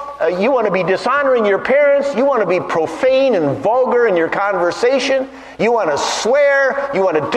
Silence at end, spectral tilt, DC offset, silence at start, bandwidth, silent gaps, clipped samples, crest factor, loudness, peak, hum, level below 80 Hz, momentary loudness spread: 0 s; -4.5 dB/octave; under 0.1%; 0 s; 11 kHz; none; under 0.1%; 12 dB; -15 LUFS; -2 dBFS; none; -54 dBFS; 4 LU